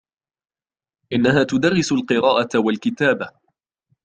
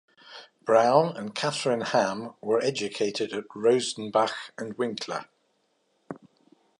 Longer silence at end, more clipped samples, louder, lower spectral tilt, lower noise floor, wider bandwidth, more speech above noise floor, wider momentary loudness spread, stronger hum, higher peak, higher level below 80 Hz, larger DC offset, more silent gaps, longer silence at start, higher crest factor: first, 0.75 s vs 0.6 s; neither; first, -19 LUFS vs -26 LUFS; first, -5.5 dB/octave vs -4 dB/octave; first, under -90 dBFS vs -71 dBFS; second, 9.2 kHz vs 11.5 kHz; first, over 72 dB vs 45 dB; second, 7 LU vs 22 LU; neither; first, -2 dBFS vs -6 dBFS; first, -58 dBFS vs -76 dBFS; neither; neither; first, 1.1 s vs 0.25 s; about the same, 18 dB vs 22 dB